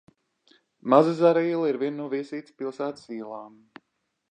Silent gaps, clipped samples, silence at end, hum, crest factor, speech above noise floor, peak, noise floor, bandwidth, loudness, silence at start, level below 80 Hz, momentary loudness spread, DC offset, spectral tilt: none; under 0.1%; 0.85 s; none; 22 dB; 52 dB; -4 dBFS; -77 dBFS; 9.4 kHz; -24 LUFS; 0.85 s; -82 dBFS; 18 LU; under 0.1%; -7.5 dB/octave